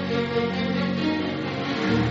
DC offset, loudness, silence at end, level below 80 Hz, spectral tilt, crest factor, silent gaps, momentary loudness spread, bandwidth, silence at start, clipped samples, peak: under 0.1%; -25 LUFS; 0 s; -52 dBFS; -5 dB/octave; 14 dB; none; 4 LU; 7.6 kHz; 0 s; under 0.1%; -10 dBFS